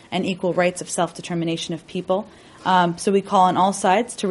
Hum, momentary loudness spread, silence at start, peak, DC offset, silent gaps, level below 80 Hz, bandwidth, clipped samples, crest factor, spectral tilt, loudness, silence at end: none; 10 LU; 0.1 s; -4 dBFS; under 0.1%; none; -60 dBFS; 11.5 kHz; under 0.1%; 16 dB; -4.5 dB/octave; -21 LUFS; 0 s